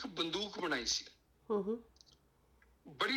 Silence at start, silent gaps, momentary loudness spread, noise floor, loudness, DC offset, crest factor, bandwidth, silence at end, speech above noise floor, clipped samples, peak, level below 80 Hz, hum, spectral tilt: 0 s; none; 12 LU; -70 dBFS; -38 LUFS; under 0.1%; 18 dB; 17.5 kHz; 0 s; 32 dB; under 0.1%; -22 dBFS; -68 dBFS; none; -2.5 dB/octave